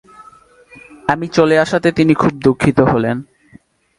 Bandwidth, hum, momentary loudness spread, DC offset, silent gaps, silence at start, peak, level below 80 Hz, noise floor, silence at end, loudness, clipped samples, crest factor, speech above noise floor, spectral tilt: 11.5 kHz; none; 8 LU; under 0.1%; none; 1.05 s; 0 dBFS; -44 dBFS; -47 dBFS; 0.75 s; -14 LUFS; under 0.1%; 16 dB; 34 dB; -7 dB/octave